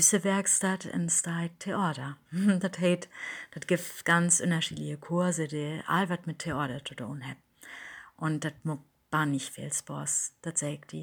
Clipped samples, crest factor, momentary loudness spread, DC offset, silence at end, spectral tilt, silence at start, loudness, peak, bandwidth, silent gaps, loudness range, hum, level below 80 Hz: under 0.1%; 22 dB; 14 LU; under 0.1%; 0 s; -3.5 dB/octave; 0 s; -30 LUFS; -10 dBFS; over 20 kHz; none; 6 LU; none; -70 dBFS